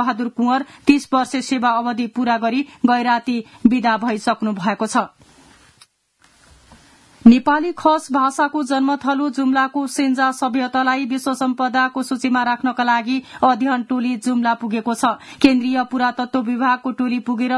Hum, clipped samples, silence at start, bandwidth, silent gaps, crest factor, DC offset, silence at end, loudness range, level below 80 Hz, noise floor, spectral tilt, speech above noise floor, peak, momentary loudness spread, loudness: none; under 0.1%; 0 s; 12 kHz; none; 18 dB; under 0.1%; 0 s; 3 LU; -58 dBFS; -58 dBFS; -4.5 dB/octave; 40 dB; 0 dBFS; 6 LU; -18 LUFS